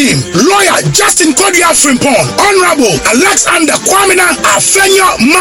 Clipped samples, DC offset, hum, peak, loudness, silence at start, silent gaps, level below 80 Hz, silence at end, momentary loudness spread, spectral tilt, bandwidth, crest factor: 0.4%; under 0.1%; none; 0 dBFS; -6 LUFS; 0 s; none; -38 dBFS; 0 s; 2 LU; -2.5 dB/octave; over 20 kHz; 8 dB